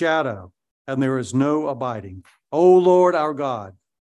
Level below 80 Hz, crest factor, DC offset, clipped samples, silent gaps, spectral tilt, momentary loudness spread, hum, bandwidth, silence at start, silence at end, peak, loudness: -56 dBFS; 16 dB; under 0.1%; under 0.1%; 0.71-0.85 s; -7 dB/octave; 17 LU; none; 9.8 kHz; 0 s; 0.45 s; -4 dBFS; -19 LUFS